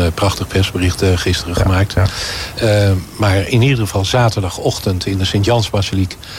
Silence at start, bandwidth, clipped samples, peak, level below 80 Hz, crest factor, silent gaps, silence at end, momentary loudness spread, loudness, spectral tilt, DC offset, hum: 0 s; 16 kHz; under 0.1%; -4 dBFS; -32 dBFS; 12 dB; none; 0 s; 5 LU; -15 LUFS; -5.5 dB/octave; under 0.1%; none